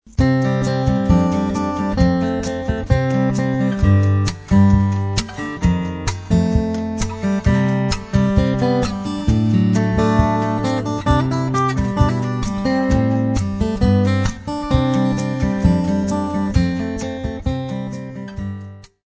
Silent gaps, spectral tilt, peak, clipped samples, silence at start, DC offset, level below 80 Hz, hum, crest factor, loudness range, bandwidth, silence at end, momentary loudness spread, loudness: none; -7 dB/octave; 0 dBFS; under 0.1%; 0.2 s; under 0.1%; -28 dBFS; none; 16 dB; 2 LU; 8 kHz; 0.25 s; 8 LU; -18 LUFS